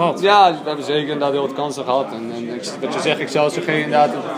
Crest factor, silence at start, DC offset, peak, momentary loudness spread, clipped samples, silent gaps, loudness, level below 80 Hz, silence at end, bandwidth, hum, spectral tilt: 18 dB; 0 s; under 0.1%; 0 dBFS; 13 LU; under 0.1%; none; -18 LUFS; -74 dBFS; 0 s; 15.5 kHz; none; -4.5 dB/octave